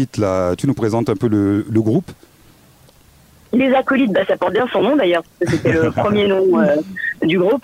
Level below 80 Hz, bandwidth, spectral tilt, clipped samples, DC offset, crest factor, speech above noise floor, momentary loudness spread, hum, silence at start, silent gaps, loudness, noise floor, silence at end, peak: -50 dBFS; 16 kHz; -7 dB/octave; under 0.1%; under 0.1%; 14 dB; 33 dB; 4 LU; none; 0 s; none; -16 LUFS; -48 dBFS; 0.05 s; -4 dBFS